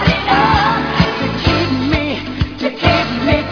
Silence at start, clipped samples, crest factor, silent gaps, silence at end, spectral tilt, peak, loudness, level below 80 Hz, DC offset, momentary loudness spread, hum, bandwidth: 0 s; under 0.1%; 14 dB; none; 0 s; -6.5 dB/octave; 0 dBFS; -15 LUFS; -28 dBFS; under 0.1%; 7 LU; none; 5.4 kHz